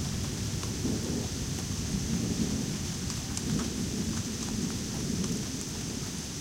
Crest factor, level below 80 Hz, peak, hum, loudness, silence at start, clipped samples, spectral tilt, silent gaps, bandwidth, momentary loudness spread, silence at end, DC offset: 18 dB; -44 dBFS; -14 dBFS; none; -32 LUFS; 0 s; under 0.1%; -4 dB/octave; none; 16 kHz; 4 LU; 0 s; under 0.1%